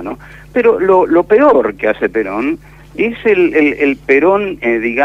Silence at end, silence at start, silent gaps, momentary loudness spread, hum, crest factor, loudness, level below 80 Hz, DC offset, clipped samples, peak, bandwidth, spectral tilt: 0 s; 0 s; none; 10 LU; 50 Hz at -40 dBFS; 12 dB; -12 LUFS; -42 dBFS; under 0.1%; under 0.1%; 0 dBFS; 7.4 kHz; -7 dB/octave